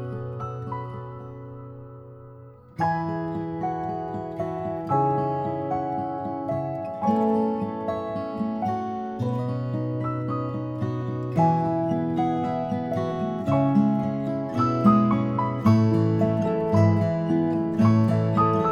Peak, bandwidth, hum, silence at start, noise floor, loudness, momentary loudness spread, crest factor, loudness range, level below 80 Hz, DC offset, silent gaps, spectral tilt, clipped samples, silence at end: -6 dBFS; 7 kHz; none; 0 s; -46 dBFS; -25 LUFS; 13 LU; 18 dB; 9 LU; -56 dBFS; under 0.1%; none; -9.5 dB/octave; under 0.1%; 0 s